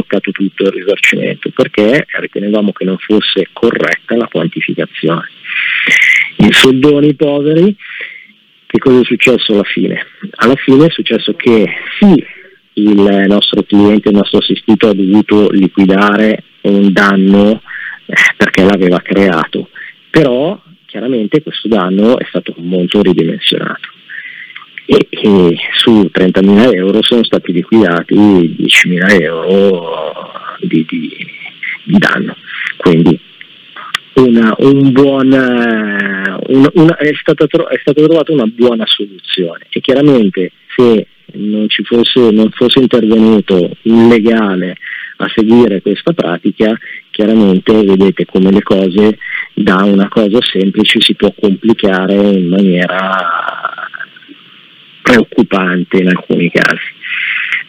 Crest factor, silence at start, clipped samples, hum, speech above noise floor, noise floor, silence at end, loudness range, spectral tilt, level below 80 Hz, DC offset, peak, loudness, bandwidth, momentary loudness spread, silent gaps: 10 dB; 0 s; 1%; none; 33 dB; -42 dBFS; 0.05 s; 4 LU; -6 dB/octave; -46 dBFS; under 0.1%; 0 dBFS; -9 LUFS; 13 kHz; 12 LU; none